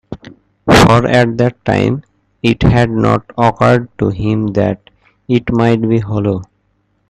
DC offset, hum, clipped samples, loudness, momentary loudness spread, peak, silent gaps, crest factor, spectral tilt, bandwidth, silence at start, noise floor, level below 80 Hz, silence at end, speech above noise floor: under 0.1%; none; under 0.1%; -13 LUFS; 10 LU; 0 dBFS; none; 14 dB; -6.5 dB/octave; 13.5 kHz; 0.1 s; -60 dBFS; -32 dBFS; 0.65 s; 48 dB